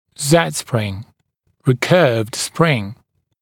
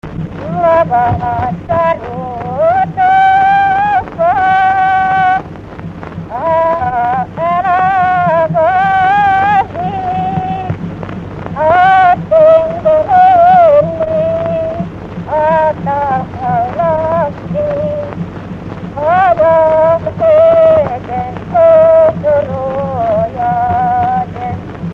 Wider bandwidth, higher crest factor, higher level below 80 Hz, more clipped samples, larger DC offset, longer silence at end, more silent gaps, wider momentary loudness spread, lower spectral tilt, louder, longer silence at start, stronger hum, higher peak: first, 17.5 kHz vs 6.8 kHz; first, 18 dB vs 10 dB; second, -56 dBFS vs -38 dBFS; neither; neither; first, 0.5 s vs 0 s; neither; second, 11 LU vs 15 LU; second, -5 dB/octave vs -8 dB/octave; second, -17 LUFS vs -11 LUFS; first, 0.2 s vs 0.05 s; neither; about the same, 0 dBFS vs 0 dBFS